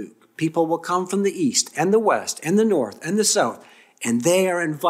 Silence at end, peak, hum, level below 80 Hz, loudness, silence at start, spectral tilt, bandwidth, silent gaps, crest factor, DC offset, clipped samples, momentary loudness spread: 0 s; -6 dBFS; none; -72 dBFS; -21 LUFS; 0 s; -4 dB/octave; 16 kHz; none; 16 dB; under 0.1%; under 0.1%; 7 LU